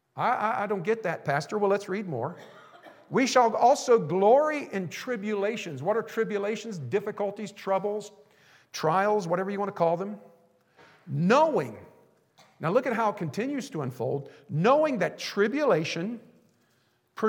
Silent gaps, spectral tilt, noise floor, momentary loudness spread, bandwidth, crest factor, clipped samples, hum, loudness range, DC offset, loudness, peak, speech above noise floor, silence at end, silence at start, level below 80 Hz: none; -5.5 dB/octave; -69 dBFS; 13 LU; 17 kHz; 20 dB; under 0.1%; none; 6 LU; under 0.1%; -27 LUFS; -8 dBFS; 42 dB; 0 s; 0.15 s; -86 dBFS